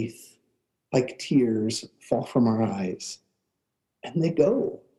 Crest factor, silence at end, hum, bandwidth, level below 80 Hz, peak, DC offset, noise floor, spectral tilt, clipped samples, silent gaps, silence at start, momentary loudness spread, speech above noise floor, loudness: 18 dB; 0.2 s; none; 12.5 kHz; -66 dBFS; -8 dBFS; under 0.1%; -81 dBFS; -6.5 dB/octave; under 0.1%; none; 0 s; 13 LU; 56 dB; -26 LUFS